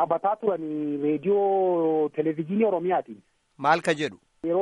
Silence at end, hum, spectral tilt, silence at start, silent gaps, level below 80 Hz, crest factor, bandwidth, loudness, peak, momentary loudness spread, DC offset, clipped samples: 0 s; none; -6.5 dB/octave; 0 s; none; -72 dBFS; 18 dB; 11.5 kHz; -25 LUFS; -8 dBFS; 6 LU; under 0.1%; under 0.1%